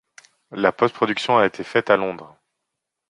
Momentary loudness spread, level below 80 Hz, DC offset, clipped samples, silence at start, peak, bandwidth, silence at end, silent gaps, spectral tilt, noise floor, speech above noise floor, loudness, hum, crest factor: 11 LU; -64 dBFS; under 0.1%; under 0.1%; 0.5 s; -2 dBFS; 10.5 kHz; 0.85 s; none; -5.5 dB/octave; -81 dBFS; 61 dB; -20 LUFS; none; 20 dB